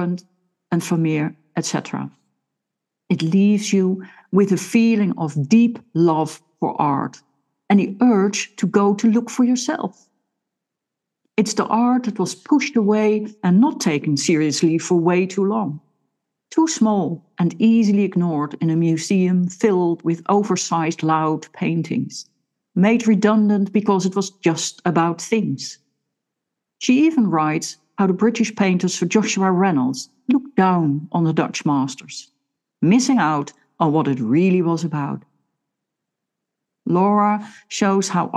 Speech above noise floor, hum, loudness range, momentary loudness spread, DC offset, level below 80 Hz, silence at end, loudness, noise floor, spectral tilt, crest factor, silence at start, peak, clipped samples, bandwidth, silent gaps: 64 dB; none; 4 LU; 10 LU; under 0.1%; -74 dBFS; 0 s; -19 LUFS; -83 dBFS; -6 dB/octave; 16 dB; 0 s; -2 dBFS; under 0.1%; 12.5 kHz; none